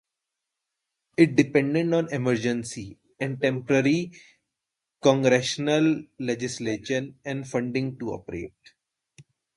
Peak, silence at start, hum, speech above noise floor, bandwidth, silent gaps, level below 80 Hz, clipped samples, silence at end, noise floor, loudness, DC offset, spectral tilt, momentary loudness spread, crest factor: -2 dBFS; 1.2 s; none; 61 dB; 11.5 kHz; none; -62 dBFS; under 0.1%; 0.35 s; -85 dBFS; -25 LUFS; under 0.1%; -5.5 dB/octave; 14 LU; 24 dB